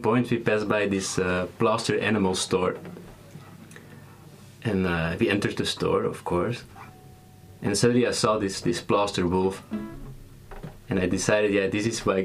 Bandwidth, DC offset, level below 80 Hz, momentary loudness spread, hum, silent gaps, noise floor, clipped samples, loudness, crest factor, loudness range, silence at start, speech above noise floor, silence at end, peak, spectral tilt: 15.5 kHz; under 0.1%; -50 dBFS; 23 LU; none; none; -49 dBFS; under 0.1%; -25 LUFS; 20 dB; 3 LU; 0 s; 24 dB; 0 s; -6 dBFS; -5 dB/octave